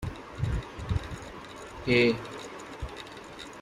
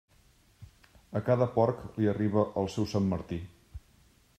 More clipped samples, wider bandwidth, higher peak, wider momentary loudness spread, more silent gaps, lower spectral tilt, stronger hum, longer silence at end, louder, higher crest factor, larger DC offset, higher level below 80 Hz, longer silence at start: neither; about the same, 14 kHz vs 14 kHz; about the same, -10 dBFS vs -12 dBFS; about the same, 19 LU vs 21 LU; neither; second, -6 dB/octave vs -8 dB/octave; neither; second, 0 s vs 0.6 s; about the same, -31 LUFS vs -30 LUFS; about the same, 22 dB vs 20 dB; neither; first, -44 dBFS vs -58 dBFS; second, 0 s vs 0.6 s